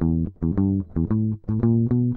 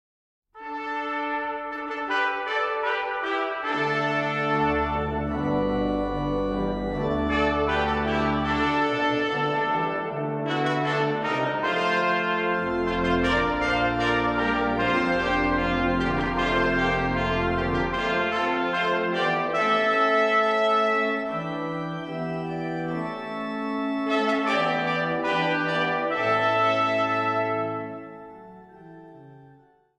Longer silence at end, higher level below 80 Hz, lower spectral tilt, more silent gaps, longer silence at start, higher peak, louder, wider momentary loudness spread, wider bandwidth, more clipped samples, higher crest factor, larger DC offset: second, 0 s vs 0.5 s; first, -36 dBFS vs -42 dBFS; first, -14.5 dB/octave vs -6 dB/octave; neither; second, 0 s vs 0.55 s; about the same, -8 dBFS vs -10 dBFS; about the same, -23 LUFS vs -24 LUFS; second, 5 LU vs 8 LU; second, 2.3 kHz vs 10 kHz; neither; about the same, 12 dB vs 14 dB; neither